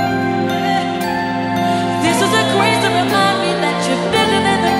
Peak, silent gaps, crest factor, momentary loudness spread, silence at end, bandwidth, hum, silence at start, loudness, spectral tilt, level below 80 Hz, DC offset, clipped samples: 0 dBFS; none; 14 dB; 5 LU; 0 s; 16.5 kHz; none; 0 s; -15 LUFS; -4.5 dB/octave; -48 dBFS; under 0.1%; under 0.1%